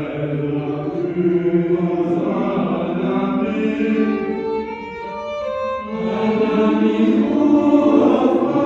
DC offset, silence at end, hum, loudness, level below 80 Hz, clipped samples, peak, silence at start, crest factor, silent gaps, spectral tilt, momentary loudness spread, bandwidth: under 0.1%; 0 s; none; -18 LUFS; -52 dBFS; under 0.1%; -2 dBFS; 0 s; 16 dB; none; -8.5 dB/octave; 10 LU; 7.2 kHz